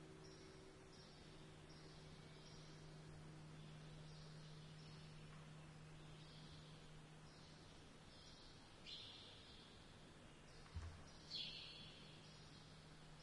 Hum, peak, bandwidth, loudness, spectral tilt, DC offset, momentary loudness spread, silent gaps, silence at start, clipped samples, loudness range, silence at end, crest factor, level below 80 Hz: none; -38 dBFS; 11 kHz; -59 LUFS; -4.5 dB/octave; under 0.1%; 8 LU; none; 0 s; under 0.1%; 5 LU; 0 s; 20 dB; -70 dBFS